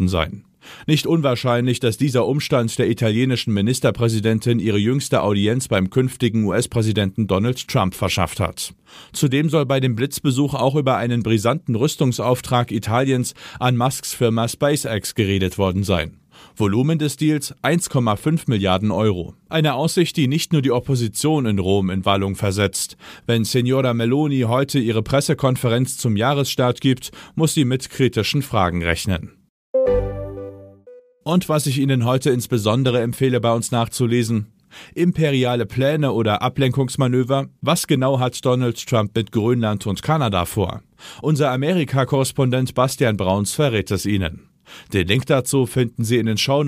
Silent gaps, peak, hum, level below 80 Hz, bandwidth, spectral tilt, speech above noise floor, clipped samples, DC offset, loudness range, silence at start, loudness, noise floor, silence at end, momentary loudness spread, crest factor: 29.49-29.74 s; -2 dBFS; none; -44 dBFS; 15.5 kHz; -5.5 dB/octave; 27 dB; under 0.1%; under 0.1%; 2 LU; 0 s; -19 LUFS; -46 dBFS; 0 s; 5 LU; 18 dB